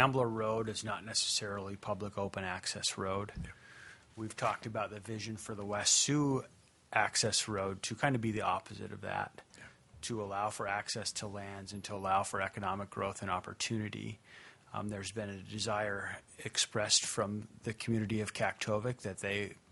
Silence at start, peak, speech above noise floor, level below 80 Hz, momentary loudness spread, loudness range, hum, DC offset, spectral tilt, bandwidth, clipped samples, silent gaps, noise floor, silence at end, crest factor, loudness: 0 s; -10 dBFS; 20 dB; -66 dBFS; 15 LU; 7 LU; none; under 0.1%; -3 dB/octave; 11.5 kHz; under 0.1%; none; -57 dBFS; 0.15 s; 26 dB; -35 LUFS